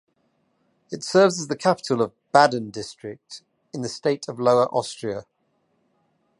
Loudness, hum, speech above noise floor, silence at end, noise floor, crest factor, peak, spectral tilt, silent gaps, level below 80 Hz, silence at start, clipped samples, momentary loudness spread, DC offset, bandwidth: -22 LUFS; none; 47 dB; 1.15 s; -69 dBFS; 24 dB; 0 dBFS; -4.5 dB/octave; none; -68 dBFS; 0.9 s; under 0.1%; 20 LU; under 0.1%; 11.5 kHz